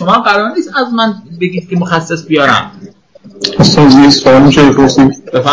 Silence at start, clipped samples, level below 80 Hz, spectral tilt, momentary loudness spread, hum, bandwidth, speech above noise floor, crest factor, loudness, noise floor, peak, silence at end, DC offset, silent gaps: 0 s; 2%; -36 dBFS; -5.5 dB/octave; 12 LU; none; 8 kHz; 30 dB; 8 dB; -8 LUFS; -37 dBFS; 0 dBFS; 0 s; under 0.1%; none